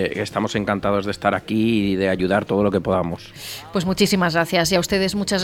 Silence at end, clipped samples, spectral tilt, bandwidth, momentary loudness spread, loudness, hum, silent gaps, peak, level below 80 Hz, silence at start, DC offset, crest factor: 0 s; under 0.1%; -5 dB/octave; 17 kHz; 6 LU; -20 LUFS; none; none; -2 dBFS; -46 dBFS; 0 s; under 0.1%; 18 dB